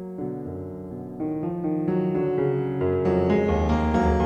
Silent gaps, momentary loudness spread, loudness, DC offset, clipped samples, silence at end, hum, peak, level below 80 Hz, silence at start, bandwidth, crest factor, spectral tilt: none; 13 LU; -25 LUFS; under 0.1%; under 0.1%; 0 s; none; -10 dBFS; -36 dBFS; 0 s; 7.8 kHz; 14 dB; -9 dB/octave